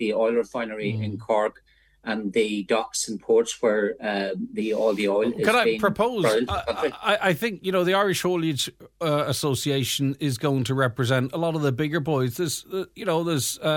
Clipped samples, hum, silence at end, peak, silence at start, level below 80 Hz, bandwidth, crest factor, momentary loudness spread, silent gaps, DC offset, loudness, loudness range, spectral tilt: under 0.1%; none; 0 s; -4 dBFS; 0 s; -56 dBFS; 17.5 kHz; 20 dB; 7 LU; none; under 0.1%; -24 LUFS; 3 LU; -4.5 dB/octave